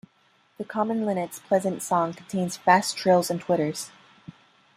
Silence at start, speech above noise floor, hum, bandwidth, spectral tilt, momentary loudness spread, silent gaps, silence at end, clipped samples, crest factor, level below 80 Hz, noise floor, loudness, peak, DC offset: 0.6 s; 39 dB; none; 15.5 kHz; -5 dB/octave; 11 LU; none; 0.9 s; under 0.1%; 22 dB; -70 dBFS; -64 dBFS; -25 LUFS; -4 dBFS; under 0.1%